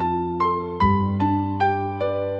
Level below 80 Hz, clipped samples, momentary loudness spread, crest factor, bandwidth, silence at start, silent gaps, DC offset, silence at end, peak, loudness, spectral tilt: -42 dBFS; under 0.1%; 4 LU; 16 dB; 6.4 kHz; 0 s; none; under 0.1%; 0 s; -6 dBFS; -22 LUFS; -9 dB/octave